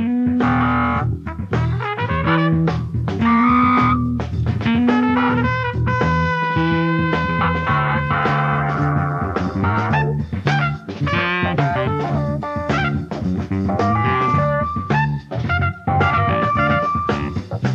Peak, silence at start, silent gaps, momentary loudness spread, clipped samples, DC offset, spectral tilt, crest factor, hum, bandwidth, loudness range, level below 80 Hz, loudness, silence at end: -4 dBFS; 0 s; none; 6 LU; under 0.1%; under 0.1%; -8 dB/octave; 14 dB; none; 7.6 kHz; 3 LU; -36 dBFS; -18 LUFS; 0 s